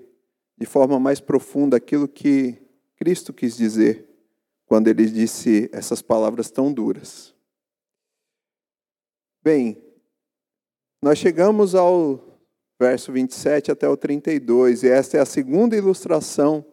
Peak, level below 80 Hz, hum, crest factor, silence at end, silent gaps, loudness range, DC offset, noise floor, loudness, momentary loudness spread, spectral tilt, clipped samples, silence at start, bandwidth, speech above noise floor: -2 dBFS; -72 dBFS; none; 18 dB; 0.1 s; none; 9 LU; under 0.1%; under -90 dBFS; -19 LUFS; 9 LU; -6 dB/octave; under 0.1%; 0.6 s; 15.5 kHz; over 72 dB